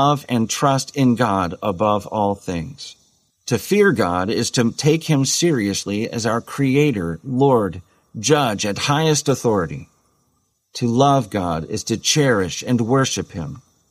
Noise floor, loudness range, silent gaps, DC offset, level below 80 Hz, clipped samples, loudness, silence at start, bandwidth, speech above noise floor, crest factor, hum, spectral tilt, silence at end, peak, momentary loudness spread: -66 dBFS; 2 LU; none; under 0.1%; -50 dBFS; under 0.1%; -19 LUFS; 0 s; 15.5 kHz; 48 dB; 16 dB; none; -4.5 dB/octave; 0.3 s; -2 dBFS; 11 LU